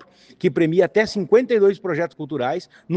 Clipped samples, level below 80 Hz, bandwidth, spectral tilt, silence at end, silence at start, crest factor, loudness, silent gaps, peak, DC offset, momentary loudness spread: under 0.1%; -60 dBFS; 8.4 kHz; -7 dB/octave; 0 s; 0.45 s; 16 dB; -20 LUFS; none; -4 dBFS; under 0.1%; 8 LU